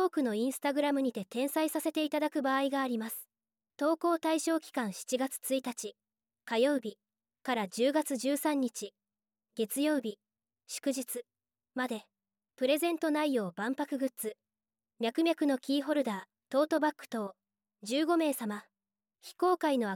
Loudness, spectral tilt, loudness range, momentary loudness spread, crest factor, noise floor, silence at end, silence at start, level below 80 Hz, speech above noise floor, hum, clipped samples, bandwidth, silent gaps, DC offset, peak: -32 LUFS; -3.5 dB/octave; 3 LU; 12 LU; 16 dB; under -90 dBFS; 0 s; 0 s; -90 dBFS; over 58 dB; none; under 0.1%; 17.5 kHz; none; under 0.1%; -16 dBFS